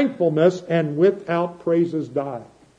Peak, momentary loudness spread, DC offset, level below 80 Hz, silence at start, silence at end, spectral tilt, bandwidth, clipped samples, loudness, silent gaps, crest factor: -4 dBFS; 9 LU; under 0.1%; -66 dBFS; 0 s; 0.35 s; -8 dB/octave; 8 kHz; under 0.1%; -21 LUFS; none; 16 dB